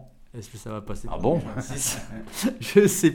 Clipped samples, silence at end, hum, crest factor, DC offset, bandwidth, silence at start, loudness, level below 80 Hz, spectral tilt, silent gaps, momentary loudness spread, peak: under 0.1%; 0 s; none; 20 dB; under 0.1%; 19 kHz; 0 s; -24 LUFS; -42 dBFS; -4.5 dB/octave; none; 21 LU; -4 dBFS